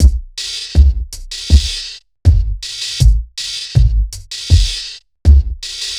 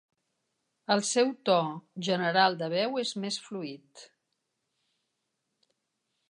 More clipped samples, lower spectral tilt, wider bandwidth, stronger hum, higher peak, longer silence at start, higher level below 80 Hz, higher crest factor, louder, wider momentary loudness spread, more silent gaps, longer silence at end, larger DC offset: first, 0.8% vs under 0.1%; about the same, -4 dB/octave vs -3.5 dB/octave; about the same, 12 kHz vs 11 kHz; neither; first, 0 dBFS vs -10 dBFS; second, 0 s vs 0.9 s; first, -14 dBFS vs -86 dBFS; second, 14 dB vs 22 dB; first, -16 LUFS vs -28 LUFS; second, 11 LU vs 14 LU; neither; second, 0 s vs 2.25 s; first, 0.1% vs under 0.1%